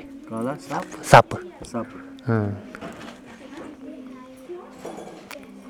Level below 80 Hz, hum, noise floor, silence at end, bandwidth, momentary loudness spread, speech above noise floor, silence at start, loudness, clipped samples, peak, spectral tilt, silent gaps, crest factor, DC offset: -54 dBFS; none; -41 dBFS; 0 s; 18.5 kHz; 25 LU; 20 dB; 0 s; -22 LUFS; under 0.1%; 0 dBFS; -5.5 dB/octave; none; 26 dB; under 0.1%